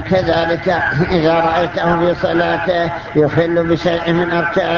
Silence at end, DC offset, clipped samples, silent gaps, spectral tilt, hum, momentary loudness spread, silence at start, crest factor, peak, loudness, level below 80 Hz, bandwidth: 0 s; under 0.1%; under 0.1%; none; -7 dB/octave; none; 2 LU; 0 s; 14 dB; -2 dBFS; -15 LUFS; -38 dBFS; 7.2 kHz